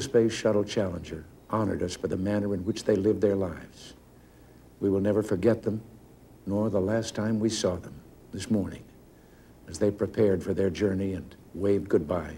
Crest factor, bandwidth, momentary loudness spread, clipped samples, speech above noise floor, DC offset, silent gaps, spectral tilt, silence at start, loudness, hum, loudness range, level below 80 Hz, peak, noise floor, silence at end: 18 dB; 16.5 kHz; 17 LU; under 0.1%; 26 dB; under 0.1%; none; -6 dB/octave; 0 s; -28 LUFS; none; 2 LU; -54 dBFS; -10 dBFS; -53 dBFS; 0 s